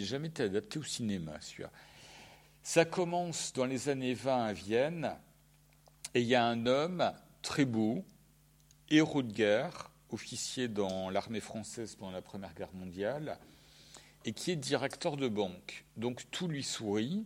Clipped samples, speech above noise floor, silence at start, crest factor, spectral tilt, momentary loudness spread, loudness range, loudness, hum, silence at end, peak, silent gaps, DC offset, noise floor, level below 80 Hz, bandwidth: under 0.1%; 30 dB; 0 s; 24 dB; -4.5 dB/octave; 17 LU; 6 LU; -35 LUFS; none; 0 s; -12 dBFS; none; under 0.1%; -65 dBFS; -68 dBFS; 16.5 kHz